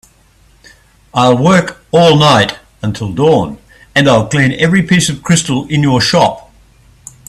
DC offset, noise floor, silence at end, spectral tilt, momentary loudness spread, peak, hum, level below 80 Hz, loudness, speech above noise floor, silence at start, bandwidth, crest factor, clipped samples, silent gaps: under 0.1%; -47 dBFS; 0.9 s; -5 dB/octave; 11 LU; 0 dBFS; none; -42 dBFS; -11 LUFS; 37 dB; 1.15 s; 13.5 kHz; 12 dB; under 0.1%; none